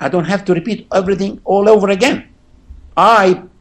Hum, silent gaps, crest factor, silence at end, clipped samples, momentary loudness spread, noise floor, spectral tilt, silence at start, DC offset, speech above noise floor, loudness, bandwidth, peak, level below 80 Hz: none; none; 14 dB; 0.15 s; under 0.1%; 8 LU; -39 dBFS; -5.5 dB/octave; 0 s; under 0.1%; 27 dB; -13 LUFS; 13 kHz; 0 dBFS; -44 dBFS